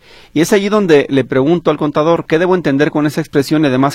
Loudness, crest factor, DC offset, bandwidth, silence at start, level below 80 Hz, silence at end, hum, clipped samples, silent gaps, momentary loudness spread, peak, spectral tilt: -13 LUFS; 12 dB; under 0.1%; 15.5 kHz; 0.35 s; -46 dBFS; 0 s; none; under 0.1%; none; 5 LU; 0 dBFS; -6 dB/octave